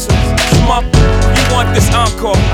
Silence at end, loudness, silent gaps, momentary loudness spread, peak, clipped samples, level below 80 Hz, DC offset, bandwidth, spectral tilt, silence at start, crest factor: 0 s; -11 LUFS; none; 2 LU; 0 dBFS; under 0.1%; -14 dBFS; under 0.1%; 17 kHz; -5 dB/octave; 0 s; 10 dB